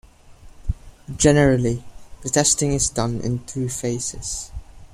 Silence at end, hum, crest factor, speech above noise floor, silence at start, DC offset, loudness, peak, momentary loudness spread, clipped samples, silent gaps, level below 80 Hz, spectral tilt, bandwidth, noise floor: 0.1 s; none; 20 dB; 25 dB; 0.25 s; under 0.1%; -21 LUFS; -2 dBFS; 17 LU; under 0.1%; none; -36 dBFS; -4.5 dB/octave; 15.5 kHz; -45 dBFS